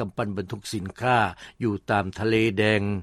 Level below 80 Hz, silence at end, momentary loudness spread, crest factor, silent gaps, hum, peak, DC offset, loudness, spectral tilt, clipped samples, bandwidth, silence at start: -54 dBFS; 0 s; 10 LU; 18 dB; none; none; -6 dBFS; under 0.1%; -25 LUFS; -6 dB/octave; under 0.1%; 13.5 kHz; 0 s